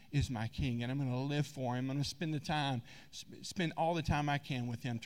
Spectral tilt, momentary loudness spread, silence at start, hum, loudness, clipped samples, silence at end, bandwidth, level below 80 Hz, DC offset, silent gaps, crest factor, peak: -6 dB/octave; 9 LU; 0.1 s; none; -37 LUFS; under 0.1%; 0 s; 15.5 kHz; -54 dBFS; 0.1%; none; 16 dB; -20 dBFS